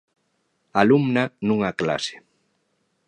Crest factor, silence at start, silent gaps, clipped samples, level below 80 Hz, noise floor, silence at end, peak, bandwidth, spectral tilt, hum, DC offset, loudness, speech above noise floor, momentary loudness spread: 22 dB; 0.75 s; none; under 0.1%; -60 dBFS; -71 dBFS; 0.9 s; -2 dBFS; 10 kHz; -6 dB/octave; none; under 0.1%; -22 LUFS; 50 dB; 9 LU